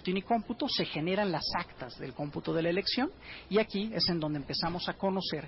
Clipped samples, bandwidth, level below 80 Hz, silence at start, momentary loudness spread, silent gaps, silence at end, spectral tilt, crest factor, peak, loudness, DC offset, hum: under 0.1%; 5.8 kHz; -58 dBFS; 0 s; 9 LU; none; 0 s; -8.5 dB/octave; 16 dB; -18 dBFS; -32 LUFS; under 0.1%; none